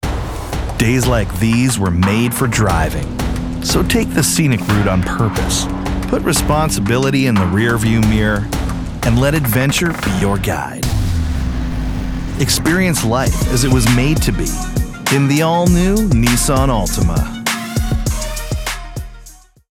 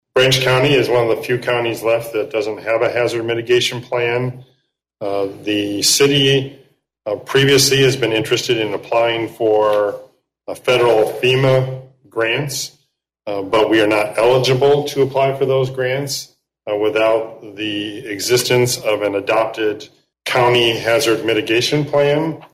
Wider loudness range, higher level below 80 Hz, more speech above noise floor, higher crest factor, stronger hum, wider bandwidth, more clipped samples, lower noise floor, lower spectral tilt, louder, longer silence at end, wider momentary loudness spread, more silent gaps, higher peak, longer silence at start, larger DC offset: about the same, 3 LU vs 4 LU; first, -24 dBFS vs -54 dBFS; second, 26 dB vs 50 dB; about the same, 14 dB vs 14 dB; neither; first, 19 kHz vs 16 kHz; neither; second, -40 dBFS vs -66 dBFS; about the same, -5 dB/octave vs -4 dB/octave; about the same, -16 LUFS vs -16 LUFS; first, 0.45 s vs 0.1 s; second, 9 LU vs 12 LU; neither; first, 0 dBFS vs -4 dBFS; second, 0 s vs 0.15 s; neither